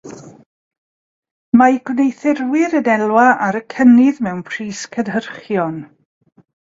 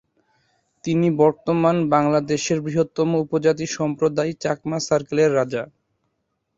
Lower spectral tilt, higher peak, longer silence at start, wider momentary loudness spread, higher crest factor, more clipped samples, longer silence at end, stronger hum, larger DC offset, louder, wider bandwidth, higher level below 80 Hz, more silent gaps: about the same, -6 dB/octave vs -6 dB/octave; about the same, 0 dBFS vs -2 dBFS; second, 0.05 s vs 0.85 s; first, 13 LU vs 7 LU; about the same, 16 dB vs 18 dB; neither; about the same, 0.8 s vs 0.9 s; neither; neither; first, -15 LUFS vs -21 LUFS; about the same, 7.8 kHz vs 7.8 kHz; about the same, -60 dBFS vs -60 dBFS; first, 0.46-0.71 s, 0.78-1.22 s, 1.31-1.52 s vs none